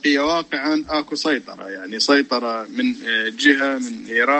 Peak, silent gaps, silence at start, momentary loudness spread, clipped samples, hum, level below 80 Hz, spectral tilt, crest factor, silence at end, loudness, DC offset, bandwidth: -2 dBFS; none; 0.05 s; 9 LU; under 0.1%; none; -56 dBFS; -2.5 dB/octave; 18 dB; 0 s; -20 LUFS; under 0.1%; 8.8 kHz